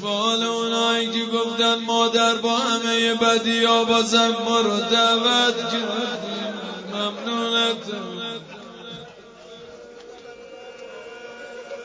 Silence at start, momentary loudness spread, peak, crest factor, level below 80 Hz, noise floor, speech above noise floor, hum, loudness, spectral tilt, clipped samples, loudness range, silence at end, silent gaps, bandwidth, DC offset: 0 s; 22 LU; -6 dBFS; 18 dB; -66 dBFS; -43 dBFS; 23 dB; none; -20 LUFS; -2.5 dB/octave; under 0.1%; 18 LU; 0 s; none; 8 kHz; under 0.1%